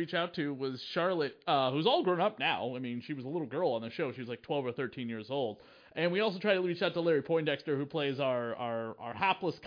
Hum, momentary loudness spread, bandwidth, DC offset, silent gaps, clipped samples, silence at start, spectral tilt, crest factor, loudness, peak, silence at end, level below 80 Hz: none; 9 LU; 5.2 kHz; under 0.1%; none; under 0.1%; 0 s; -7.5 dB/octave; 18 dB; -33 LUFS; -14 dBFS; 0 s; -80 dBFS